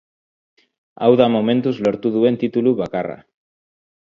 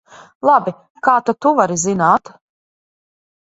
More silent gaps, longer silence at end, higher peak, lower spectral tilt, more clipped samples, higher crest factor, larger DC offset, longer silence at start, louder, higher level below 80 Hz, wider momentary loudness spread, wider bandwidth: second, none vs 0.90-0.95 s; second, 0.9 s vs 1.35 s; about the same, 0 dBFS vs 0 dBFS; first, -8.5 dB/octave vs -5 dB/octave; neither; about the same, 18 dB vs 18 dB; neither; first, 1 s vs 0.45 s; second, -18 LUFS vs -15 LUFS; about the same, -60 dBFS vs -60 dBFS; first, 11 LU vs 5 LU; second, 7.2 kHz vs 8 kHz